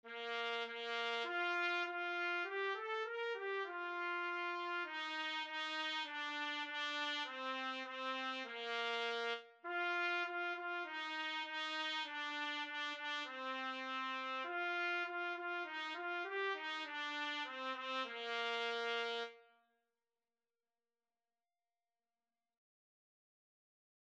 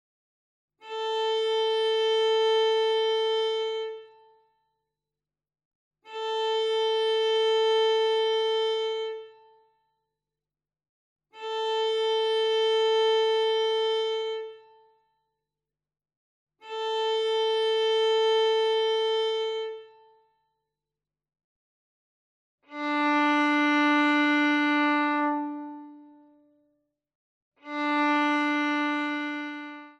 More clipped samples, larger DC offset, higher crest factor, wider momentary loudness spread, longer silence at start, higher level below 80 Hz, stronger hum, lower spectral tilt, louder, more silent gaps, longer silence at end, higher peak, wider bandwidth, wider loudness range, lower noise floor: neither; neither; about the same, 18 dB vs 14 dB; second, 4 LU vs 13 LU; second, 0.05 s vs 0.85 s; about the same, under -90 dBFS vs under -90 dBFS; neither; about the same, -0.5 dB/octave vs -1.5 dB/octave; second, -41 LUFS vs -25 LUFS; second, none vs 5.65-5.91 s, 10.89-11.16 s, 16.17-16.47 s, 21.44-22.58 s, 27.15-27.52 s; first, 4.7 s vs 0.1 s; second, -26 dBFS vs -14 dBFS; about the same, 9.2 kHz vs 9.8 kHz; second, 3 LU vs 9 LU; about the same, under -90 dBFS vs under -90 dBFS